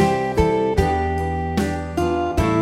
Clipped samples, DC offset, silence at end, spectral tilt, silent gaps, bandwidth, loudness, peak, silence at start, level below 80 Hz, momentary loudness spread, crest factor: under 0.1%; under 0.1%; 0 s; -7 dB/octave; none; 15.5 kHz; -21 LUFS; -4 dBFS; 0 s; -30 dBFS; 4 LU; 16 dB